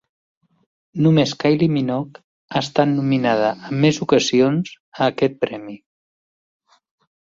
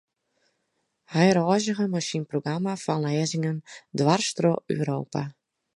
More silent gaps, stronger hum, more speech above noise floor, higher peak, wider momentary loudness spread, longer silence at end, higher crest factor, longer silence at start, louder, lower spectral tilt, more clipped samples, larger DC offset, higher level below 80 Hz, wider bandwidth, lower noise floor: first, 2.24-2.48 s, 4.80-4.92 s vs none; neither; first, over 72 dB vs 51 dB; first, -2 dBFS vs -6 dBFS; about the same, 11 LU vs 10 LU; first, 1.55 s vs 0.45 s; about the same, 18 dB vs 20 dB; second, 0.95 s vs 1.1 s; first, -19 LUFS vs -25 LUFS; about the same, -6 dB/octave vs -5.5 dB/octave; neither; neither; first, -60 dBFS vs -68 dBFS; second, 7.8 kHz vs 11.5 kHz; first, under -90 dBFS vs -76 dBFS